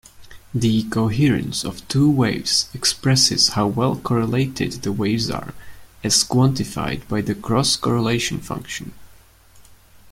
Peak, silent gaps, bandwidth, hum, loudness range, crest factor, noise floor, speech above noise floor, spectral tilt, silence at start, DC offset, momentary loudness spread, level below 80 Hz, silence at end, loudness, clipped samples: -2 dBFS; none; 16 kHz; none; 4 LU; 18 dB; -49 dBFS; 29 dB; -4 dB/octave; 0.2 s; under 0.1%; 13 LU; -46 dBFS; 0 s; -19 LUFS; under 0.1%